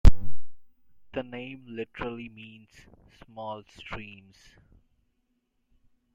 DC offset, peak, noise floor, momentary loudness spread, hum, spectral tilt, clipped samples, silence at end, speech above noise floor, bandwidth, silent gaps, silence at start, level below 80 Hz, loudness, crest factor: under 0.1%; -2 dBFS; -75 dBFS; 20 LU; none; -7 dB/octave; under 0.1%; 2.15 s; 35 dB; 7.8 kHz; none; 0.05 s; -32 dBFS; -37 LUFS; 22 dB